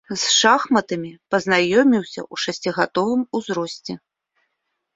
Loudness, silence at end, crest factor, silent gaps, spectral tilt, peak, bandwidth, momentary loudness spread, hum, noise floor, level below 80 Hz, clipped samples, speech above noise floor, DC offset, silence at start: -19 LUFS; 1 s; 20 dB; none; -3 dB/octave; -2 dBFS; 8 kHz; 14 LU; none; -76 dBFS; -64 dBFS; under 0.1%; 56 dB; under 0.1%; 0.1 s